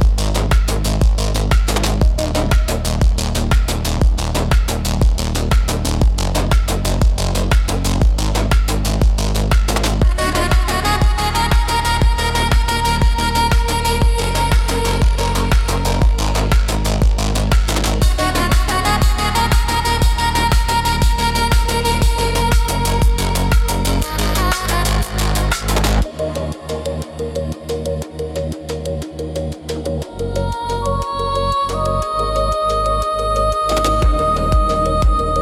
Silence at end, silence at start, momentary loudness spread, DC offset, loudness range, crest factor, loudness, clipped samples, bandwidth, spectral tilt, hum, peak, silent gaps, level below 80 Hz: 0 s; 0 s; 7 LU; under 0.1%; 5 LU; 12 dB; -17 LUFS; under 0.1%; 16 kHz; -4.5 dB/octave; none; -2 dBFS; none; -18 dBFS